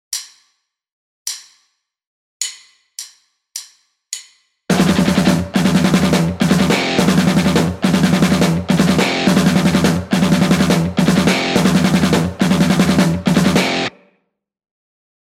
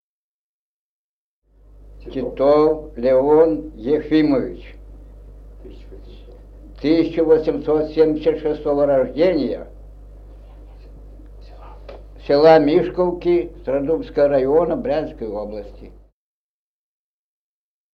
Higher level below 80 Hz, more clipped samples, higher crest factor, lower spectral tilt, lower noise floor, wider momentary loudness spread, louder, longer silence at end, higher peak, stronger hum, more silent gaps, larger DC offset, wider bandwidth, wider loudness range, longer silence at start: about the same, -40 dBFS vs -40 dBFS; neither; second, 14 dB vs 20 dB; second, -5 dB/octave vs -8.5 dB/octave; second, -70 dBFS vs under -90 dBFS; about the same, 15 LU vs 15 LU; first, -14 LUFS vs -18 LUFS; second, 1.45 s vs 2.05 s; about the same, -2 dBFS vs 0 dBFS; second, none vs 50 Hz at -40 dBFS; first, 0.92-1.25 s, 2.07-2.40 s vs none; neither; first, 16 kHz vs 6 kHz; first, 16 LU vs 7 LU; second, 0.1 s vs 1.85 s